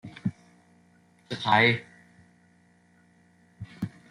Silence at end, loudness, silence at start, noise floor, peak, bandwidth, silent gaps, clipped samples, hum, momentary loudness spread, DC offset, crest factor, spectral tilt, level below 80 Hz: 0.25 s; -26 LUFS; 0.05 s; -62 dBFS; -8 dBFS; 11 kHz; none; under 0.1%; none; 22 LU; under 0.1%; 24 dB; -6 dB/octave; -68 dBFS